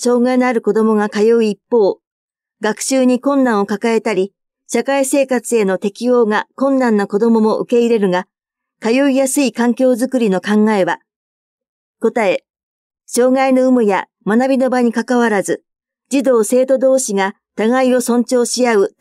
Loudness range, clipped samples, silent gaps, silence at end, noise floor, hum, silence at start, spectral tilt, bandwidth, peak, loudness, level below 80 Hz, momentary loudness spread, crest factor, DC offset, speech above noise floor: 2 LU; under 0.1%; 2.07-2.28 s, 11.16-11.58 s, 11.69-11.94 s, 12.50-12.54 s, 12.63-12.90 s; 0.15 s; -71 dBFS; none; 0 s; -4.5 dB/octave; 14.5 kHz; -2 dBFS; -15 LUFS; -76 dBFS; 7 LU; 12 dB; under 0.1%; 57 dB